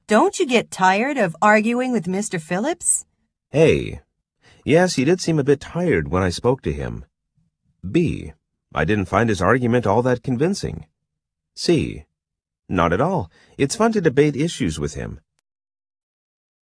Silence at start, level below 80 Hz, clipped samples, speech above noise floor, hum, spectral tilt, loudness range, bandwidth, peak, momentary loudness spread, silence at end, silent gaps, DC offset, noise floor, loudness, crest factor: 0.1 s; -44 dBFS; under 0.1%; 63 dB; none; -5 dB/octave; 4 LU; 11 kHz; 0 dBFS; 14 LU; 1.5 s; none; under 0.1%; -82 dBFS; -20 LUFS; 20 dB